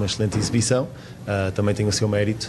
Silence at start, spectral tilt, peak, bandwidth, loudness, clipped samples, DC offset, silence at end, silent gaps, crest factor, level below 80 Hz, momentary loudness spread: 0 s; -5 dB/octave; -6 dBFS; 12.5 kHz; -22 LUFS; under 0.1%; under 0.1%; 0 s; none; 16 dB; -46 dBFS; 7 LU